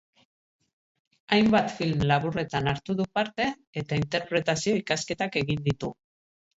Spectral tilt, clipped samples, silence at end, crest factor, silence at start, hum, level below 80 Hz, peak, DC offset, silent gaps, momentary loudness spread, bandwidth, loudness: -5.5 dB/octave; under 0.1%; 0.65 s; 20 dB; 1.3 s; none; -54 dBFS; -8 dBFS; under 0.1%; 3.67-3.73 s; 7 LU; 8 kHz; -27 LUFS